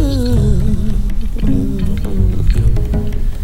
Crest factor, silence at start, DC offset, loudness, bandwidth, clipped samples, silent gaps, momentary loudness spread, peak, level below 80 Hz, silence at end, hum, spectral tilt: 12 dB; 0 s; under 0.1%; -17 LUFS; 13.5 kHz; under 0.1%; none; 6 LU; 0 dBFS; -16 dBFS; 0 s; none; -8 dB/octave